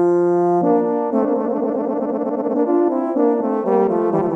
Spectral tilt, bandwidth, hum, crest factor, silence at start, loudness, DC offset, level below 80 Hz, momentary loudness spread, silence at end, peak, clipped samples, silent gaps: -10.5 dB/octave; 3.1 kHz; none; 12 dB; 0 s; -18 LUFS; under 0.1%; -64 dBFS; 5 LU; 0 s; -6 dBFS; under 0.1%; none